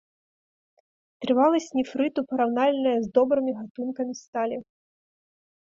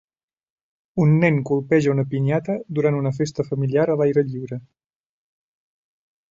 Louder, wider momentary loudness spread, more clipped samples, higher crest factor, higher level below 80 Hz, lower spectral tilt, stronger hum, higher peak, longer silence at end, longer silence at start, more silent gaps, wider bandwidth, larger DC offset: second, -25 LUFS vs -21 LUFS; about the same, 11 LU vs 9 LU; neither; about the same, 18 dB vs 18 dB; second, -70 dBFS vs -60 dBFS; second, -5 dB/octave vs -8.5 dB/octave; neither; second, -8 dBFS vs -4 dBFS; second, 1.15 s vs 1.7 s; first, 1.2 s vs 0.95 s; first, 3.70-3.75 s, 4.28-4.33 s vs none; about the same, 7.6 kHz vs 7.6 kHz; neither